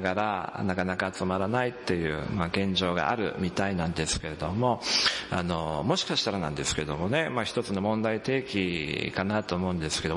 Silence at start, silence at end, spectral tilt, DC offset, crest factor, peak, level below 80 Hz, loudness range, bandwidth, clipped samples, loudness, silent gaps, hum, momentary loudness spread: 0 s; 0 s; -4.5 dB/octave; under 0.1%; 18 dB; -10 dBFS; -52 dBFS; 1 LU; 11.5 kHz; under 0.1%; -28 LUFS; none; none; 4 LU